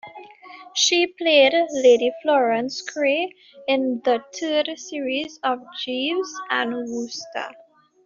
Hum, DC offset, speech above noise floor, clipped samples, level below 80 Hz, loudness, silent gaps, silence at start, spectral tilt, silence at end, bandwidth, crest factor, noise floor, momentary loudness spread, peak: none; under 0.1%; 22 dB; under 0.1%; -72 dBFS; -21 LUFS; none; 0.05 s; 0.5 dB/octave; 0.55 s; 7.6 kHz; 18 dB; -44 dBFS; 13 LU; -4 dBFS